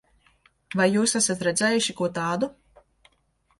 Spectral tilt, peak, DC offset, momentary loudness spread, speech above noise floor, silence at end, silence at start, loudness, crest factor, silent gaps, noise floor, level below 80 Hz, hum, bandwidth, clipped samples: -3.5 dB/octave; -8 dBFS; under 0.1%; 8 LU; 44 dB; 1.1 s; 0.7 s; -24 LUFS; 18 dB; none; -68 dBFS; -64 dBFS; none; 11.5 kHz; under 0.1%